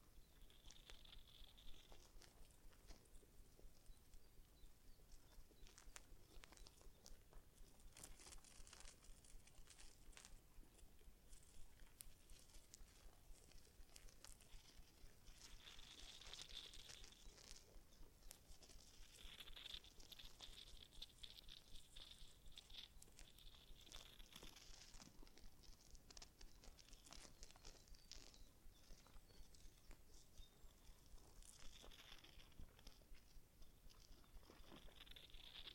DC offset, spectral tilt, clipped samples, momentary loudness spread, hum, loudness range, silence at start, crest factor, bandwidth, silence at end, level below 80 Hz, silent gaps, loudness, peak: under 0.1%; -2 dB/octave; under 0.1%; 10 LU; none; 7 LU; 0 s; 30 dB; 16.5 kHz; 0 s; -66 dBFS; none; -64 LUFS; -30 dBFS